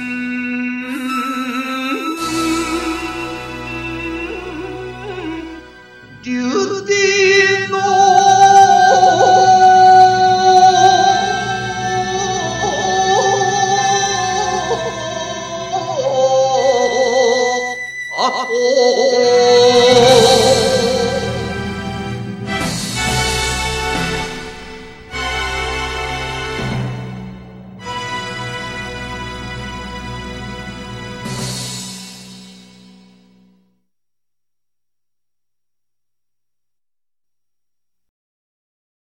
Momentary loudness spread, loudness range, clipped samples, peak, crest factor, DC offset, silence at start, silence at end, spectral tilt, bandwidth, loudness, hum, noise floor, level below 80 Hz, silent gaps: 18 LU; 17 LU; under 0.1%; 0 dBFS; 16 dB; under 0.1%; 0 s; 6.5 s; -3.5 dB/octave; 13.5 kHz; -14 LUFS; 60 Hz at -45 dBFS; under -90 dBFS; -38 dBFS; none